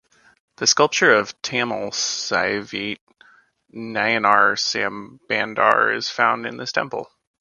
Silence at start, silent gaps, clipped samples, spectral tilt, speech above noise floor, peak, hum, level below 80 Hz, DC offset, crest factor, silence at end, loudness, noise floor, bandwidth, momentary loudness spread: 0.6 s; 3.01-3.07 s; under 0.1%; -2 dB/octave; 35 dB; 0 dBFS; none; -64 dBFS; under 0.1%; 22 dB; 0.35 s; -19 LUFS; -56 dBFS; 11 kHz; 13 LU